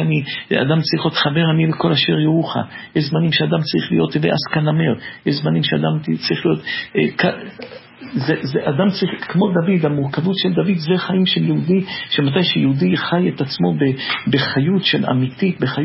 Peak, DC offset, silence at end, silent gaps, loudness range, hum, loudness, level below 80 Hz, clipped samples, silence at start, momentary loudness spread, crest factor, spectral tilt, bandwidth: -2 dBFS; under 0.1%; 0 s; none; 3 LU; none; -17 LUFS; -54 dBFS; under 0.1%; 0 s; 5 LU; 16 dB; -10 dB/octave; 5.8 kHz